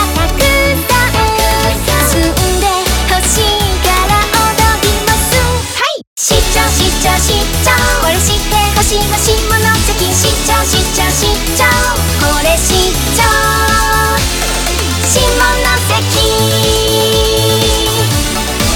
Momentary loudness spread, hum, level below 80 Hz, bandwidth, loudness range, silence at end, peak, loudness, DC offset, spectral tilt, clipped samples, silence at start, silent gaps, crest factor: 3 LU; none; -18 dBFS; over 20 kHz; 1 LU; 0 s; 0 dBFS; -10 LUFS; under 0.1%; -3 dB/octave; under 0.1%; 0 s; 6.07-6.16 s; 10 dB